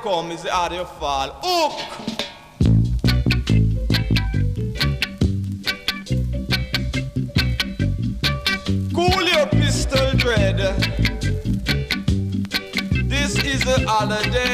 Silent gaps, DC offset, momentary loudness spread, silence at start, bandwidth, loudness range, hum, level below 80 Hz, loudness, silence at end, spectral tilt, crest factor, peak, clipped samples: none; under 0.1%; 7 LU; 0 s; 15.5 kHz; 3 LU; none; -28 dBFS; -21 LUFS; 0 s; -5 dB/octave; 16 dB; -4 dBFS; under 0.1%